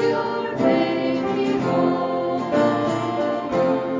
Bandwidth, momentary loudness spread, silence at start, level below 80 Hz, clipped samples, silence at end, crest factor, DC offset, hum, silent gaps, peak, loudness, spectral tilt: 7.6 kHz; 4 LU; 0 s; -56 dBFS; under 0.1%; 0 s; 14 dB; under 0.1%; none; none; -6 dBFS; -21 LUFS; -7 dB/octave